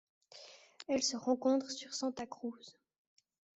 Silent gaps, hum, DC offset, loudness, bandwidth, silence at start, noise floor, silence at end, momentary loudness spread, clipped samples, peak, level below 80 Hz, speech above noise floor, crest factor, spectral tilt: none; none; under 0.1%; -36 LUFS; 8.2 kHz; 0.35 s; -57 dBFS; 0.85 s; 22 LU; under 0.1%; -20 dBFS; -80 dBFS; 21 dB; 20 dB; -2.5 dB/octave